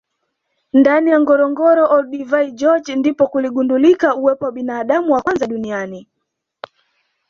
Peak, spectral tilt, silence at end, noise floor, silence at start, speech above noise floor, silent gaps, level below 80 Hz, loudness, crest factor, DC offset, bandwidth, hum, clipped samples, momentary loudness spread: -2 dBFS; -6 dB/octave; 1.25 s; -75 dBFS; 0.75 s; 61 dB; none; -60 dBFS; -15 LUFS; 14 dB; under 0.1%; 7.2 kHz; none; under 0.1%; 10 LU